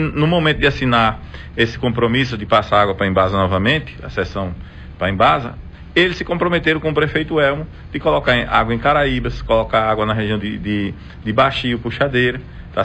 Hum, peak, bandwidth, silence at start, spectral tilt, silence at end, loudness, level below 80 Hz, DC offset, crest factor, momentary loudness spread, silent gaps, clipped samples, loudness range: none; -2 dBFS; 9 kHz; 0 s; -7 dB/octave; 0 s; -17 LUFS; -34 dBFS; under 0.1%; 16 dB; 11 LU; none; under 0.1%; 2 LU